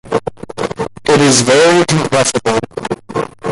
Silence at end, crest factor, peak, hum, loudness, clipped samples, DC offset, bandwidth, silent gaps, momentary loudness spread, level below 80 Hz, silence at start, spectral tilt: 0 s; 14 dB; 0 dBFS; none; -13 LUFS; under 0.1%; under 0.1%; 11.5 kHz; none; 14 LU; -44 dBFS; 0.05 s; -4 dB/octave